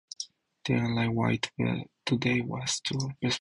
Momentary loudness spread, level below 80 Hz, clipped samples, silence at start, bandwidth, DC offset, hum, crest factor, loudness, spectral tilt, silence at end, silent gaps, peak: 12 LU; -58 dBFS; under 0.1%; 0.2 s; 11.5 kHz; under 0.1%; none; 16 dB; -30 LUFS; -4.5 dB/octave; 0 s; none; -14 dBFS